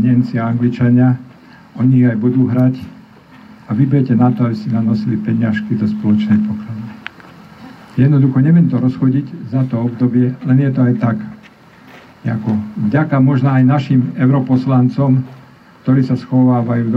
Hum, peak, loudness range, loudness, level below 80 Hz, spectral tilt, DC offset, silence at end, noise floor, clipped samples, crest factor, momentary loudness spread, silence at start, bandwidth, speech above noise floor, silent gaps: none; -2 dBFS; 3 LU; -14 LUFS; -56 dBFS; -10.5 dB/octave; under 0.1%; 0 s; -42 dBFS; under 0.1%; 12 dB; 11 LU; 0 s; 5.6 kHz; 29 dB; none